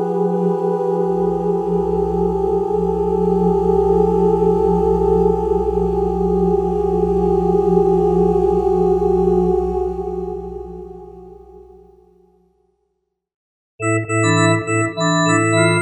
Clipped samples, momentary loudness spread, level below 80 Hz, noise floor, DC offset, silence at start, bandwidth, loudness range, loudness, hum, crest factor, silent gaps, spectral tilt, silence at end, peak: under 0.1%; 7 LU; -32 dBFS; -72 dBFS; under 0.1%; 0 s; 8.8 kHz; 11 LU; -17 LUFS; 60 Hz at -40 dBFS; 16 dB; 13.34-13.78 s; -6.5 dB/octave; 0 s; -2 dBFS